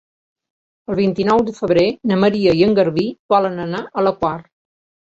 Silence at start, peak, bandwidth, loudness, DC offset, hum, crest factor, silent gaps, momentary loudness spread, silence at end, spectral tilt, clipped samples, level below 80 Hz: 0.9 s; -2 dBFS; 7.8 kHz; -17 LUFS; under 0.1%; none; 16 dB; 3.19-3.29 s; 9 LU; 0.7 s; -7.5 dB/octave; under 0.1%; -50 dBFS